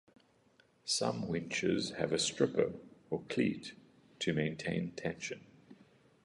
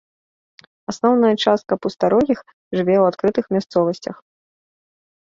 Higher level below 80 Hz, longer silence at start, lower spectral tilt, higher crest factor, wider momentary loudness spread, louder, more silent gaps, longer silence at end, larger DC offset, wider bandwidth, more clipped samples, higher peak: second, -68 dBFS vs -58 dBFS; about the same, 0.85 s vs 0.9 s; second, -4 dB/octave vs -6.5 dB/octave; about the same, 22 dB vs 18 dB; about the same, 12 LU vs 12 LU; second, -36 LUFS vs -18 LUFS; second, none vs 2.53-2.71 s; second, 0.5 s vs 1.1 s; neither; first, 11.5 kHz vs 7.8 kHz; neither; second, -14 dBFS vs -2 dBFS